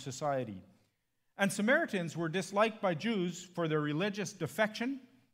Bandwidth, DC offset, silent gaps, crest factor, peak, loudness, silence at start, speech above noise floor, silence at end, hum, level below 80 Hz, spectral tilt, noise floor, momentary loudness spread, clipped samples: 16 kHz; under 0.1%; none; 20 dB; -14 dBFS; -34 LUFS; 0 s; 45 dB; 0.35 s; none; -82 dBFS; -5 dB/octave; -79 dBFS; 9 LU; under 0.1%